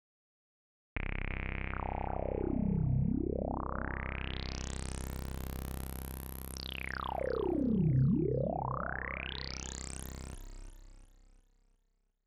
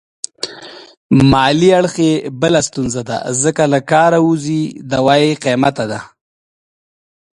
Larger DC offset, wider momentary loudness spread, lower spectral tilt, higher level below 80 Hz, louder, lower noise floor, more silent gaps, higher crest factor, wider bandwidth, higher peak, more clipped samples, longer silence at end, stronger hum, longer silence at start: neither; about the same, 13 LU vs 14 LU; about the same, -6 dB/octave vs -5 dB/octave; about the same, -44 dBFS vs -44 dBFS; second, -36 LUFS vs -14 LUFS; first, -76 dBFS vs -35 dBFS; second, none vs 0.97-1.10 s; about the same, 16 dB vs 14 dB; first, 17.5 kHz vs 11.5 kHz; second, -20 dBFS vs 0 dBFS; neither; about the same, 1.2 s vs 1.3 s; neither; first, 0.95 s vs 0.45 s